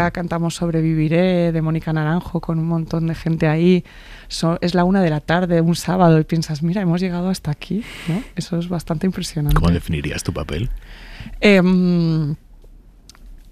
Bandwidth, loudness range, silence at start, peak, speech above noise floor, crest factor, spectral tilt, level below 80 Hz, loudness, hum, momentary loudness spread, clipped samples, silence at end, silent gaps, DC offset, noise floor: 14 kHz; 4 LU; 0 s; -2 dBFS; 26 dB; 16 dB; -7 dB/octave; -34 dBFS; -19 LUFS; none; 11 LU; under 0.1%; 0 s; none; under 0.1%; -44 dBFS